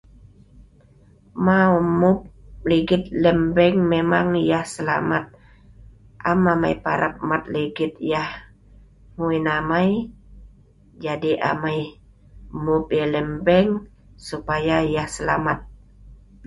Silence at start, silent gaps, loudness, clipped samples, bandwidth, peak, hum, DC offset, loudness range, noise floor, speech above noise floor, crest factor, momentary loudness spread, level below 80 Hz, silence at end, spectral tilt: 0.55 s; none; -21 LUFS; under 0.1%; 11.5 kHz; -4 dBFS; none; under 0.1%; 6 LU; -52 dBFS; 32 dB; 18 dB; 12 LU; -46 dBFS; 0 s; -6.5 dB/octave